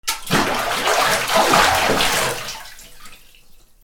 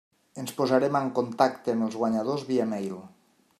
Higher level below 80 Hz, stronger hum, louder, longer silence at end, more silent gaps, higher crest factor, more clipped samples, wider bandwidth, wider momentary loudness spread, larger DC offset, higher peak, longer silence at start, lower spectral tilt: first, -40 dBFS vs -74 dBFS; neither; first, -17 LUFS vs -27 LUFS; second, 0.25 s vs 0.5 s; neither; about the same, 20 dB vs 22 dB; neither; first, over 20 kHz vs 14.5 kHz; about the same, 15 LU vs 13 LU; neither; first, 0 dBFS vs -6 dBFS; second, 0.05 s vs 0.35 s; second, -2 dB/octave vs -6 dB/octave